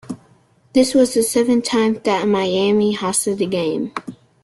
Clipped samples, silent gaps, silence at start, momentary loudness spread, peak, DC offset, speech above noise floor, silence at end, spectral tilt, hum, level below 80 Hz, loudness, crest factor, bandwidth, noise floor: under 0.1%; none; 0.1 s; 13 LU; -2 dBFS; under 0.1%; 37 dB; 0.3 s; -4 dB/octave; none; -56 dBFS; -17 LUFS; 16 dB; 12.5 kHz; -54 dBFS